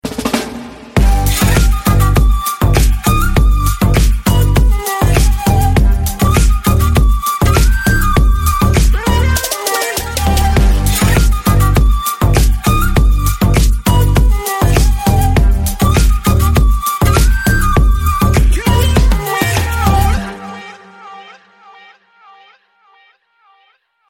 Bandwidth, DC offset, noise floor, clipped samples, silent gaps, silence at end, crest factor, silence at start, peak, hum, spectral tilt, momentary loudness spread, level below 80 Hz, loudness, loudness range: 17 kHz; under 0.1%; -56 dBFS; under 0.1%; none; 2.85 s; 10 dB; 0.05 s; 0 dBFS; none; -5 dB/octave; 3 LU; -14 dBFS; -13 LUFS; 2 LU